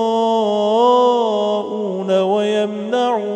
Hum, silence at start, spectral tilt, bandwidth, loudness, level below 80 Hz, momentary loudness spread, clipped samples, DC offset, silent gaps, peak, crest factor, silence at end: none; 0 s; -5.5 dB/octave; 9 kHz; -17 LUFS; -70 dBFS; 7 LU; under 0.1%; under 0.1%; none; -2 dBFS; 14 dB; 0 s